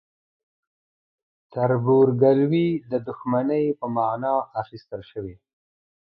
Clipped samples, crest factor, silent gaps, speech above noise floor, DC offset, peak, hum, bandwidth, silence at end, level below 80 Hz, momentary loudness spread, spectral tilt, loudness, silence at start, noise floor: under 0.1%; 18 dB; none; over 68 dB; under 0.1%; -6 dBFS; none; 5.4 kHz; 0.8 s; -62 dBFS; 18 LU; -11.5 dB/octave; -22 LUFS; 1.55 s; under -90 dBFS